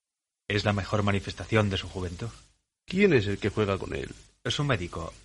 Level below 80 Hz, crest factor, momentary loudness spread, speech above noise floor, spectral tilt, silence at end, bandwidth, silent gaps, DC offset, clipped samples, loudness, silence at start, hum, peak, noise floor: -48 dBFS; 22 dB; 14 LU; 19 dB; -6 dB/octave; 0.05 s; 11.5 kHz; none; under 0.1%; under 0.1%; -28 LUFS; 0.5 s; none; -6 dBFS; -47 dBFS